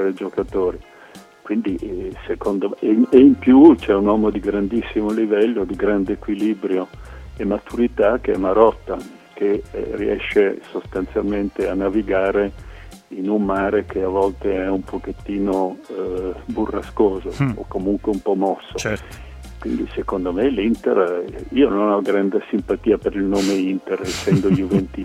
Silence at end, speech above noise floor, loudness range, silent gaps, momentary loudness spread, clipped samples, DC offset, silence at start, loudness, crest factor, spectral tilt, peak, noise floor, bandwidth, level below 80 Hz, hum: 0 s; 25 dB; 8 LU; none; 11 LU; under 0.1%; under 0.1%; 0 s; -19 LUFS; 18 dB; -7 dB/octave; 0 dBFS; -43 dBFS; 13 kHz; -40 dBFS; none